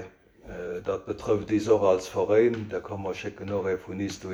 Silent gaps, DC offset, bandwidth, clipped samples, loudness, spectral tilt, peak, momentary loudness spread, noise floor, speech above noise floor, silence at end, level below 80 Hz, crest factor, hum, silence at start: none; under 0.1%; 12.5 kHz; under 0.1%; -27 LUFS; -6 dB/octave; -10 dBFS; 13 LU; -47 dBFS; 20 dB; 0 s; -56 dBFS; 18 dB; none; 0 s